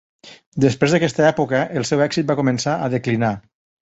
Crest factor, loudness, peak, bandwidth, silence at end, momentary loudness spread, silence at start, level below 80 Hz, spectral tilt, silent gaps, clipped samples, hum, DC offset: 16 dB; -19 LUFS; -2 dBFS; 8.2 kHz; 0.4 s; 5 LU; 0.25 s; -54 dBFS; -5.5 dB/octave; 0.46-0.52 s; under 0.1%; none; under 0.1%